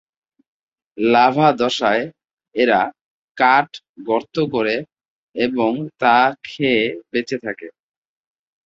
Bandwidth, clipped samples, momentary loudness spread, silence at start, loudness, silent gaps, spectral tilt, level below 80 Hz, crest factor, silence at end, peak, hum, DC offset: 7.8 kHz; under 0.1%; 14 LU; 0.95 s; -18 LUFS; 2.33-2.37 s, 3.01-3.35 s, 3.89-3.94 s, 5.10-5.34 s; -5.5 dB/octave; -62 dBFS; 18 dB; 0.95 s; 0 dBFS; none; under 0.1%